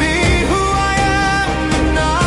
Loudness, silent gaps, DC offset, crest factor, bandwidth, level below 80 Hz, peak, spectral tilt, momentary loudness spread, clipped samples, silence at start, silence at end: -15 LUFS; none; under 0.1%; 10 dB; 11.5 kHz; -22 dBFS; -4 dBFS; -4.5 dB/octave; 2 LU; under 0.1%; 0 s; 0 s